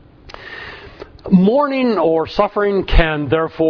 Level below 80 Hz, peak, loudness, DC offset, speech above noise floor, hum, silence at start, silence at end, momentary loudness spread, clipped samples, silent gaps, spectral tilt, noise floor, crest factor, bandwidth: -24 dBFS; 0 dBFS; -16 LUFS; under 0.1%; 23 dB; none; 0.3 s; 0 s; 20 LU; under 0.1%; none; -8.5 dB/octave; -37 dBFS; 16 dB; 5.4 kHz